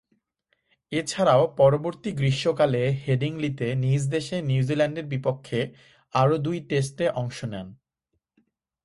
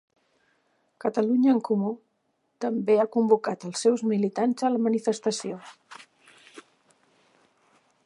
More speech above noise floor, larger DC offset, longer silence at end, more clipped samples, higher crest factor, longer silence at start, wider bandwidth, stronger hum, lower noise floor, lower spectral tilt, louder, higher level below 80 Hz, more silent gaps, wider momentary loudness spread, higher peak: first, 55 dB vs 49 dB; neither; second, 1.1 s vs 1.45 s; neither; about the same, 18 dB vs 20 dB; second, 0.9 s vs 1.05 s; about the same, 11.5 kHz vs 11.5 kHz; neither; first, -79 dBFS vs -73 dBFS; about the same, -6.5 dB/octave vs -5.5 dB/octave; about the same, -25 LUFS vs -25 LUFS; first, -58 dBFS vs -84 dBFS; neither; about the same, 11 LU vs 12 LU; about the same, -8 dBFS vs -8 dBFS